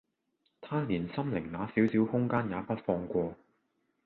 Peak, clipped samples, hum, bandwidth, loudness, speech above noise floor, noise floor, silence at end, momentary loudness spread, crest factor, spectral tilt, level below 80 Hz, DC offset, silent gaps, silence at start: -14 dBFS; under 0.1%; none; 4.4 kHz; -32 LUFS; 47 dB; -78 dBFS; 0.7 s; 7 LU; 18 dB; -10 dB/octave; -60 dBFS; under 0.1%; none; 0.6 s